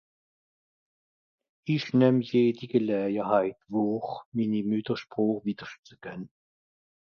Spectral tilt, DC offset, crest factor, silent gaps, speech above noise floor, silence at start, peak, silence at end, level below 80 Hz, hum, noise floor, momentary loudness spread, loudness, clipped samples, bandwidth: -8.5 dB/octave; under 0.1%; 20 dB; 4.26-4.32 s, 5.79-5.83 s; over 63 dB; 1.65 s; -10 dBFS; 0.85 s; -72 dBFS; none; under -90 dBFS; 19 LU; -27 LUFS; under 0.1%; 6.8 kHz